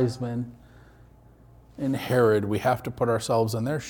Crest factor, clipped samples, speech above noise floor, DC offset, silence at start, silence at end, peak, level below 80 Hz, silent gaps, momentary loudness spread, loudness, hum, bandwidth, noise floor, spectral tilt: 18 dB; under 0.1%; 28 dB; under 0.1%; 0 s; 0 s; -10 dBFS; -56 dBFS; none; 11 LU; -25 LUFS; none; 19 kHz; -53 dBFS; -6.5 dB/octave